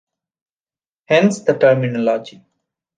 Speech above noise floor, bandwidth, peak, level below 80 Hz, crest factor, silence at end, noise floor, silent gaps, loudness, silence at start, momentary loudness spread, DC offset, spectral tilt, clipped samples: over 75 dB; 9.6 kHz; -2 dBFS; -66 dBFS; 16 dB; 0.7 s; under -90 dBFS; none; -16 LUFS; 1.1 s; 6 LU; under 0.1%; -6 dB/octave; under 0.1%